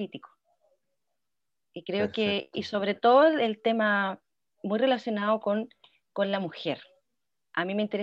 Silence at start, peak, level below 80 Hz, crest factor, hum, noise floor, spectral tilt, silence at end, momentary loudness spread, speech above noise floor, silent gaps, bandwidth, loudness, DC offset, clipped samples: 0 s; -10 dBFS; -78 dBFS; 18 dB; none; -89 dBFS; -6.5 dB/octave; 0 s; 18 LU; 62 dB; none; 7.6 kHz; -27 LUFS; under 0.1%; under 0.1%